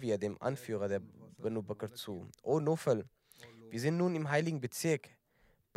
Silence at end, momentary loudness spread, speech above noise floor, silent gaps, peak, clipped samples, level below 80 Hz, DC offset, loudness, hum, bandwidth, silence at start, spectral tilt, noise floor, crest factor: 0.7 s; 12 LU; 36 dB; none; -18 dBFS; under 0.1%; -80 dBFS; under 0.1%; -36 LUFS; none; 16 kHz; 0 s; -6 dB/octave; -71 dBFS; 18 dB